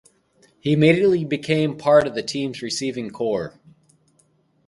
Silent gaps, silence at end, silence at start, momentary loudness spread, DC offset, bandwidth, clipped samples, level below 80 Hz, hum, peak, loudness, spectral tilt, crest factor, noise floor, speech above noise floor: none; 1.15 s; 0.65 s; 11 LU; under 0.1%; 11.5 kHz; under 0.1%; -58 dBFS; none; -2 dBFS; -21 LUFS; -6 dB/octave; 18 dB; -62 dBFS; 42 dB